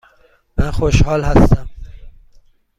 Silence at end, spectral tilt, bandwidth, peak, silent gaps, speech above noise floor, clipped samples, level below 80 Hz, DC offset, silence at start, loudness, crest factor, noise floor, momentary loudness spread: 0.7 s; -7 dB/octave; 11.5 kHz; 0 dBFS; none; 41 dB; under 0.1%; -22 dBFS; under 0.1%; 0.55 s; -16 LUFS; 16 dB; -53 dBFS; 13 LU